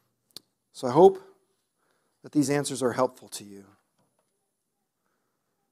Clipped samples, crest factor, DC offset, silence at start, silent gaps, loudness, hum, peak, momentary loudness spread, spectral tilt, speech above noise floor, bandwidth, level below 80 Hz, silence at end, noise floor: under 0.1%; 24 dB; under 0.1%; 0.75 s; none; -24 LUFS; none; -4 dBFS; 21 LU; -5.5 dB/octave; 56 dB; 14.5 kHz; -72 dBFS; 2.1 s; -80 dBFS